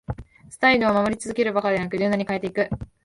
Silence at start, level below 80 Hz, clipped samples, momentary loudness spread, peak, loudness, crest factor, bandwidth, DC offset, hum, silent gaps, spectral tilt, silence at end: 0.1 s; -48 dBFS; under 0.1%; 9 LU; -4 dBFS; -22 LUFS; 18 dB; 11.5 kHz; under 0.1%; none; none; -5.5 dB/octave; 0.2 s